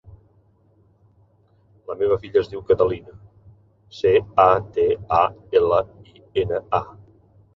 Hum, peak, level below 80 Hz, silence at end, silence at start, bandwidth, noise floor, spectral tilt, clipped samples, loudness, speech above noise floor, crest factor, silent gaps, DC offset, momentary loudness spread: none; -2 dBFS; -48 dBFS; 0.65 s; 1.9 s; 6.4 kHz; -58 dBFS; -7.5 dB/octave; under 0.1%; -20 LUFS; 38 dB; 22 dB; none; under 0.1%; 10 LU